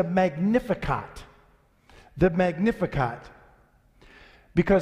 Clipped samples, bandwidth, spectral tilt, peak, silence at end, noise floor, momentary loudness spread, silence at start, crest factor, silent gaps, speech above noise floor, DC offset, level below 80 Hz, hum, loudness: under 0.1%; 11.5 kHz; -8 dB/octave; -8 dBFS; 0 s; -60 dBFS; 20 LU; 0 s; 18 dB; none; 36 dB; under 0.1%; -44 dBFS; none; -25 LUFS